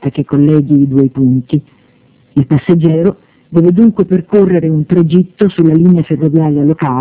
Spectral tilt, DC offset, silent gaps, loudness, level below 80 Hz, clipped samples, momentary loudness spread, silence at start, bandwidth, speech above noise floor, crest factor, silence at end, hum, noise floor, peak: -13.5 dB/octave; under 0.1%; none; -10 LUFS; -44 dBFS; 1%; 6 LU; 0 s; 4 kHz; 38 dB; 10 dB; 0 s; none; -48 dBFS; 0 dBFS